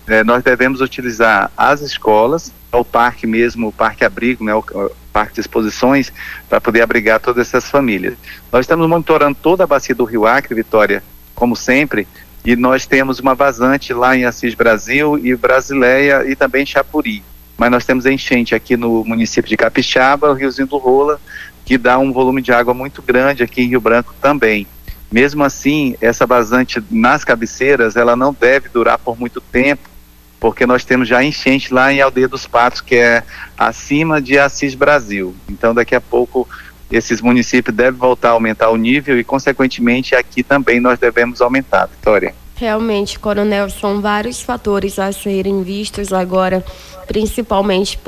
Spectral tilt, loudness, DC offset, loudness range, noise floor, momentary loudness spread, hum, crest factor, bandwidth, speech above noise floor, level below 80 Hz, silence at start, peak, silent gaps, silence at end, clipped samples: -5 dB/octave; -13 LUFS; under 0.1%; 3 LU; -41 dBFS; 7 LU; none; 12 dB; 15.5 kHz; 27 dB; -38 dBFS; 0.05 s; 0 dBFS; none; 0.05 s; under 0.1%